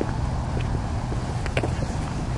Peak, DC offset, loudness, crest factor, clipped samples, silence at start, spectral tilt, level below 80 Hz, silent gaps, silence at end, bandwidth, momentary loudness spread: -6 dBFS; under 0.1%; -27 LUFS; 18 dB; under 0.1%; 0 s; -6.5 dB/octave; -32 dBFS; none; 0 s; 11.5 kHz; 2 LU